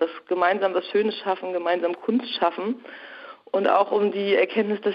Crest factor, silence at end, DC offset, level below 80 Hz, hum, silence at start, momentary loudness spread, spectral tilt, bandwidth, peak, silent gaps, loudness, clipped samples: 18 dB; 0 s; under 0.1%; -78 dBFS; none; 0 s; 12 LU; -7.5 dB/octave; 5.6 kHz; -6 dBFS; none; -23 LUFS; under 0.1%